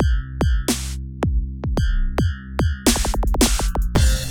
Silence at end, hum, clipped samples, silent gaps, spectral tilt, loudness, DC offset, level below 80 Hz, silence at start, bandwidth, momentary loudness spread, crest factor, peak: 0 s; none; under 0.1%; none; -4.5 dB/octave; -21 LUFS; under 0.1%; -22 dBFS; 0 s; over 20 kHz; 6 LU; 16 dB; -4 dBFS